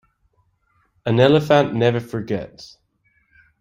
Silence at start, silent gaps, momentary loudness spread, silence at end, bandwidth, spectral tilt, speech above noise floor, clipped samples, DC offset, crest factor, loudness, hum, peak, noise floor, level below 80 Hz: 1.05 s; none; 14 LU; 0.95 s; 15.5 kHz; -7 dB/octave; 46 dB; under 0.1%; under 0.1%; 20 dB; -18 LUFS; none; -2 dBFS; -64 dBFS; -56 dBFS